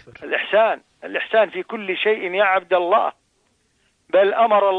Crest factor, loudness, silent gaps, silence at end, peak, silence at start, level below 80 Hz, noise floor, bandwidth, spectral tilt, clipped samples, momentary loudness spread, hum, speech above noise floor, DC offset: 14 dB; -19 LUFS; none; 0 s; -6 dBFS; 0.2 s; -68 dBFS; -65 dBFS; 4.7 kHz; -5.5 dB/octave; under 0.1%; 11 LU; none; 46 dB; under 0.1%